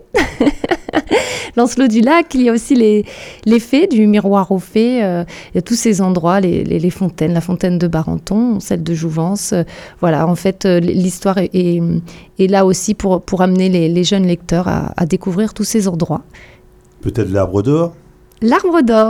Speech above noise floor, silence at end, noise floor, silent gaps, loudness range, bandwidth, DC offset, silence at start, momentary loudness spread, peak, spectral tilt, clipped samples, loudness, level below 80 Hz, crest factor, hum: 30 dB; 0 s; -44 dBFS; none; 4 LU; 16 kHz; under 0.1%; 0.15 s; 7 LU; 0 dBFS; -6 dB/octave; under 0.1%; -14 LUFS; -38 dBFS; 12 dB; none